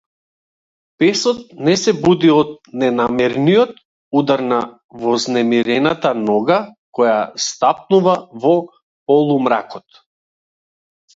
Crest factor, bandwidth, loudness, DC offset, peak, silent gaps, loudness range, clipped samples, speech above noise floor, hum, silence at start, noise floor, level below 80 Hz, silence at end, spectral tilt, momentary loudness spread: 16 dB; 8 kHz; -16 LUFS; under 0.1%; 0 dBFS; 3.85-4.11 s, 4.84-4.89 s, 6.78-6.93 s, 8.82-9.06 s; 2 LU; under 0.1%; over 75 dB; none; 1 s; under -90 dBFS; -58 dBFS; 1.35 s; -5 dB/octave; 7 LU